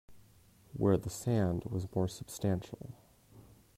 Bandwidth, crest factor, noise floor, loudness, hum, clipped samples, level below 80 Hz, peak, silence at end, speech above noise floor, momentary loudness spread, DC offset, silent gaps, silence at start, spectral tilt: 16 kHz; 18 dB; -62 dBFS; -34 LUFS; none; under 0.1%; -60 dBFS; -18 dBFS; 0.35 s; 29 dB; 17 LU; under 0.1%; none; 0.1 s; -7 dB/octave